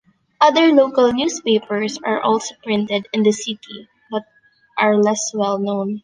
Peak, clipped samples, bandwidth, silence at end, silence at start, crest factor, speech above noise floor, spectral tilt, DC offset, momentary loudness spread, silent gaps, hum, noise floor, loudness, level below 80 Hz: -2 dBFS; under 0.1%; 10 kHz; 0.05 s; 0.4 s; 16 dB; 39 dB; -4 dB/octave; under 0.1%; 15 LU; none; none; -57 dBFS; -18 LUFS; -62 dBFS